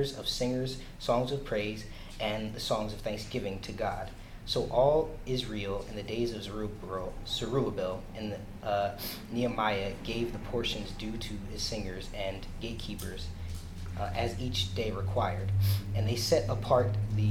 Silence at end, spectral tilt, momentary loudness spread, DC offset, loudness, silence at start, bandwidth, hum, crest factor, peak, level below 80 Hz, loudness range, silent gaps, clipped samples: 0 s; -5.5 dB/octave; 11 LU; under 0.1%; -33 LUFS; 0 s; 16.5 kHz; none; 18 dB; -14 dBFS; -44 dBFS; 5 LU; none; under 0.1%